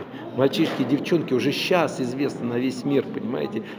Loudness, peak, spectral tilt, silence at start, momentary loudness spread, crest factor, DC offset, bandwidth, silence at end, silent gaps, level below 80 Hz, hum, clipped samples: -24 LUFS; -6 dBFS; -6 dB/octave; 0 s; 6 LU; 18 dB; under 0.1%; over 20 kHz; 0 s; none; -70 dBFS; none; under 0.1%